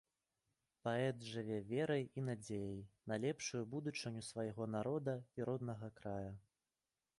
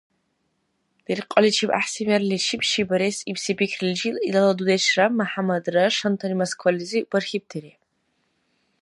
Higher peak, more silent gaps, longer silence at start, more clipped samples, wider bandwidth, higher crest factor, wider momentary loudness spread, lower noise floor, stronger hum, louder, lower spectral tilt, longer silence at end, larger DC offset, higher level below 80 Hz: second, -26 dBFS vs 0 dBFS; neither; second, 0.85 s vs 1.1 s; neither; about the same, 11.5 kHz vs 11.5 kHz; about the same, 18 dB vs 22 dB; about the same, 8 LU vs 8 LU; first, under -90 dBFS vs -72 dBFS; neither; second, -44 LUFS vs -22 LUFS; first, -5.5 dB/octave vs -4 dB/octave; second, 0.8 s vs 1.15 s; neither; second, -74 dBFS vs -68 dBFS